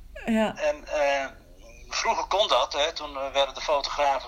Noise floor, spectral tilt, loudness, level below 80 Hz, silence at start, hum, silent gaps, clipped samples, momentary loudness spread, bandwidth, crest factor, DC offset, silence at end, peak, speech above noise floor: -47 dBFS; -2.5 dB/octave; -26 LUFS; -48 dBFS; 0 s; none; none; under 0.1%; 6 LU; 15.5 kHz; 20 dB; under 0.1%; 0 s; -8 dBFS; 22 dB